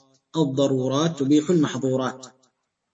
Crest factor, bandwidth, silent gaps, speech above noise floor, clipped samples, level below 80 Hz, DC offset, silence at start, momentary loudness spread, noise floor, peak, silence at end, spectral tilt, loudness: 16 dB; 8 kHz; none; 47 dB; under 0.1%; -68 dBFS; under 0.1%; 0.35 s; 10 LU; -68 dBFS; -8 dBFS; 0.65 s; -6 dB/octave; -23 LUFS